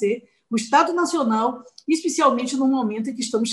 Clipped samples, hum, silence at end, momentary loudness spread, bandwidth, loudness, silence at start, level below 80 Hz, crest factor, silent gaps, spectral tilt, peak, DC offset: under 0.1%; none; 0 s; 8 LU; 12 kHz; -21 LUFS; 0 s; -70 dBFS; 18 dB; none; -3.5 dB/octave; -4 dBFS; under 0.1%